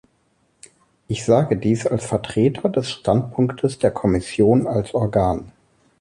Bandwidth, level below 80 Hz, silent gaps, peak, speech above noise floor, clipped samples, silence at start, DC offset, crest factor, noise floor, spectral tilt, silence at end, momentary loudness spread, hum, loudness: 11.5 kHz; -44 dBFS; none; -2 dBFS; 45 dB; under 0.1%; 1.1 s; under 0.1%; 18 dB; -64 dBFS; -7 dB/octave; 0.5 s; 6 LU; none; -20 LUFS